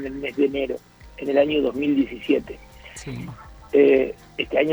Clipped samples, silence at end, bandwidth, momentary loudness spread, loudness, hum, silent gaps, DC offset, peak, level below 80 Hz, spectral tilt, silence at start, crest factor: under 0.1%; 0 s; over 20 kHz; 21 LU; -22 LUFS; none; none; under 0.1%; -6 dBFS; -48 dBFS; -6 dB/octave; 0 s; 18 dB